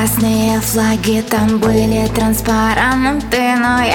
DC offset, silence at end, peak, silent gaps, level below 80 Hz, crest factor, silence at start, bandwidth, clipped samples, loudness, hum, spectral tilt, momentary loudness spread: under 0.1%; 0 s; 0 dBFS; none; -30 dBFS; 12 dB; 0 s; 19 kHz; under 0.1%; -14 LUFS; none; -4.5 dB/octave; 2 LU